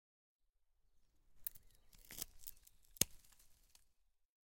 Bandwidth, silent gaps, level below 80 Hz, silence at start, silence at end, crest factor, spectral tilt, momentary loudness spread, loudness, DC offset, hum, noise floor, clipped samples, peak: 17 kHz; none; -68 dBFS; 1.3 s; 0.95 s; 38 dB; -1.5 dB/octave; 20 LU; -44 LUFS; under 0.1%; none; -77 dBFS; under 0.1%; -14 dBFS